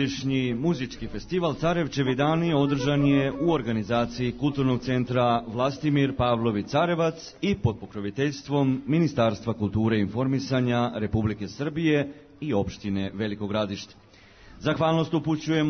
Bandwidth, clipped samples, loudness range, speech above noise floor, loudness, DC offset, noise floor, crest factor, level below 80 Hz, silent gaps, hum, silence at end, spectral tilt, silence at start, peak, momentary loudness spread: 6.6 kHz; under 0.1%; 4 LU; 25 dB; -26 LUFS; under 0.1%; -50 dBFS; 14 dB; -50 dBFS; none; none; 0 s; -7 dB/octave; 0 s; -10 dBFS; 7 LU